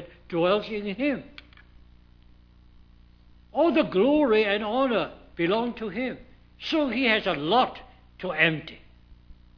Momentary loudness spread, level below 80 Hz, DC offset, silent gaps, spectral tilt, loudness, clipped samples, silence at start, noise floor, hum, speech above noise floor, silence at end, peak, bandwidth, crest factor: 13 LU; -54 dBFS; under 0.1%; none; -7 dB/octave; -25 LUFS; under 0.1%; 0 s; -54 dBFS; 60 Hz at -50 dBFS; 29 dB; 0.25 s; -6 dBFS; 5.4 kHz; 20 dB